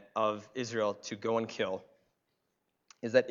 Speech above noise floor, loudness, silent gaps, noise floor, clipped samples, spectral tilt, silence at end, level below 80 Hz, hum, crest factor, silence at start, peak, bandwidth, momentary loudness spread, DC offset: 48 dB; -34 LUFS; none; -81 dBFS; under 0.1%; -4.5 dB/octave; 0 s; -82 dBFS; none; 24 dB; 0 s; -12 dBFS; 7.6 kHz; 9 LU; under 0.1%